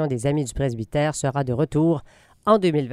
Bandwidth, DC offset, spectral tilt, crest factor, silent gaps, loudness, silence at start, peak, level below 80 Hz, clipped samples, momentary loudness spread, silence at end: 13.5 kHz; under 0.1%; -6.5 dB/octave; 16 dB; none; -23 LUFS; 0 s; -6 dBFS; -44 dBFS; under 0.1%; 7 LU; 0 s